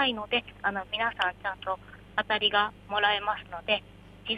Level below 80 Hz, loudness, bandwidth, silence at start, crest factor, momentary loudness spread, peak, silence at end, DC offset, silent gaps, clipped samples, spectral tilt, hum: -56 dBFS; -29 LUFS; 12.5 kHz; 0 s; 20 dB; 10 LU; -10 dBFS; 0 s; under 0.1%; none; under 0.1%; -4.5 dB/octave; 50 Hz at -55 dBFS